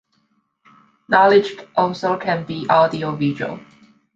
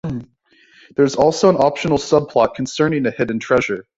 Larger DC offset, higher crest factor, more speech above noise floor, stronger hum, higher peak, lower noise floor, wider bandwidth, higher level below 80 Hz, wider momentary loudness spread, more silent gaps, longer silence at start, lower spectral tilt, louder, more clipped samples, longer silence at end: neither; about the same, 18 dB vs 16 dB; first, 48 dB vs 38 dB; neither; about the same, -2 dBFS vs -2 dBFS; first, -66 dBFS vs -54 dBFS; about the same, 7.6 kHz vs 8 kHz; second, -62 dBFS vs -50 dBFS; first, 11 LU vs 8 LU; neither; first, 1.1 s vs 0.05 s; about the same, -6.5 dB/octave vs -5.5 dB/octave; about the same, -18 LUFS vs -17 LUFS; neither; first, 0.55 s vs 0.15 s